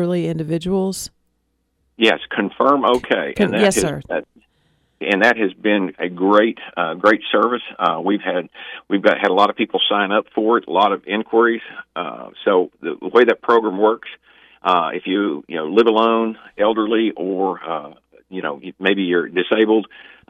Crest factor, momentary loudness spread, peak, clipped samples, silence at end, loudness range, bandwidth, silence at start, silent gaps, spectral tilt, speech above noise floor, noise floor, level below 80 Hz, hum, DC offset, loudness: 16 dB; 12 LU; -2 dBFS; under 0.1%; 0.3 s; 2 LU; 15 kHz; 0 s; none; -4.5 dB/octave; 50 dB; -68 dBFS; -56 dBFS; none; under 0.1%; -18 LUFS